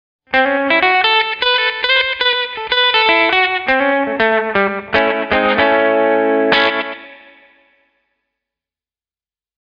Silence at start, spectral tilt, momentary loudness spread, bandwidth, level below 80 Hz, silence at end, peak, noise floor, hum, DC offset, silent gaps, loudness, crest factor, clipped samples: 0.3 s; -5 dB/octave; 5 LU; 6.8 kHz; -50 dBFS; 2.5 s; 0 dBFS; under -90 dBFS; none; under 0.1%; none; -13 LUFS; 16 dB; under 0.1%